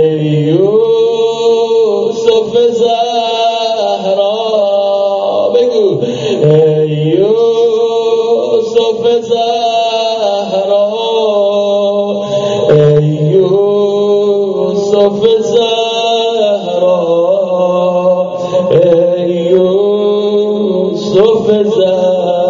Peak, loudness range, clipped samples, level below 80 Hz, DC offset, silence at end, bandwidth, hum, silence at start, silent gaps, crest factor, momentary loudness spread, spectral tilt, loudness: 0 dBFS; 1 LU; 0.1%; -54 dBFS; under 0.1%; 0 s; 7.6 kHz; none; 0 s; none; 10 dB; 4 LU; -5.5 dB/octave; -11 LUFS